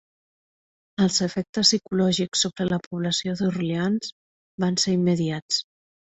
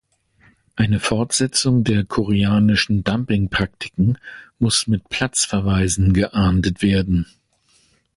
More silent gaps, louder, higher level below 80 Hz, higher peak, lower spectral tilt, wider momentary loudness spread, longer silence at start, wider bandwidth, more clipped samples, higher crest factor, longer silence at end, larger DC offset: first, 1.49-1.53 s, 2.86-2.91 s, 4.12-4.58 s, 5.42-5.49 s vs none; second, -23 LUFS vs -19 LUFS; second, -60 dBFS vs -34 dBFS; about the same, -4 dBFS vs -4 dBFS; about the same, -4 dB/octave vs -4.5 dB/octave; about the same, 7 LU vs 6 LU; first, 1 s vs 0.75 s; second, 8.2 kHz vs 11.5 kHz; neither; first, 20 dB vs 14 dB; second, 0.5 s vs 0.95 s; neither